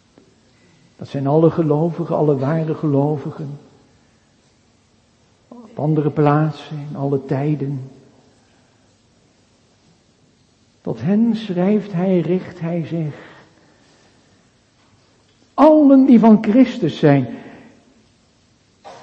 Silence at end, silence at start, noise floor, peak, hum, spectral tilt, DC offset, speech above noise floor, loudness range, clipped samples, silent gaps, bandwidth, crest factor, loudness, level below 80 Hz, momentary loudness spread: 0.1 s; 1 s; -56 dBFS; 0 dBFS; none; -9.5 dB/octave; under 0.1%; 41 dB; 12 LU; under 0.1%; none; 7.6 kHz; 18 dB; -17 LUFS; -60 dBFS; 20 LU